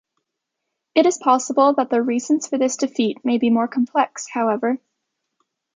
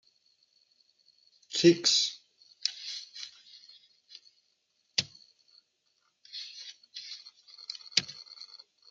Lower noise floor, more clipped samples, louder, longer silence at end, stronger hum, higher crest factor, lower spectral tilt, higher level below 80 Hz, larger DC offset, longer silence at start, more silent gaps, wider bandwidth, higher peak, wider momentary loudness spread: first, -80 dBFS vs -75 dBFS; neither; first, -20 LUFS vs -29 LUFS; first, 1 s vs 0.45 s; neither; second, 18 dB vs 28 dB; about the same, -4 dB/octave vs -3 dB/octave; first, -72 dBFS vs -80 dBFS; neither; second, 0.95 s vs 1.5 s; neither; about the same, 9.4 kHz vs 9.4 kHz; first, -2 dBFS vs -6 dBFS; second, 6 LU vs 28 LU